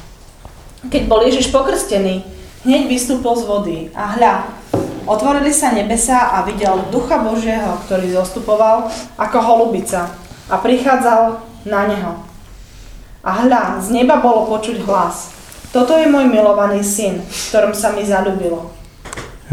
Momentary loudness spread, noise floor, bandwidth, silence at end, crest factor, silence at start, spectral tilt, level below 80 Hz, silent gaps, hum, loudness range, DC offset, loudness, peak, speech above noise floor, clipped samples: 13 LU; -37 dBFS; 17 kHz; 0 s; 16 dB; 0 s; -4 dB/octave; -36 dBFS; none; none; 3 LU; under 0.1%; -15 LUFS; 0 dBFS; 23 dB; under 0.1%